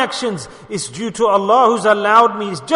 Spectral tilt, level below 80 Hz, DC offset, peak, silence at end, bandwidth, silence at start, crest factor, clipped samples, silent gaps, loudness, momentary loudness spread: -4 dB/octave; -58 dBFS; under 0.1%; 0 dBFS; 0 s; 11 kHz; 0 s; 14 dB; under 0.1%; none; -15 LUFS; 13 LU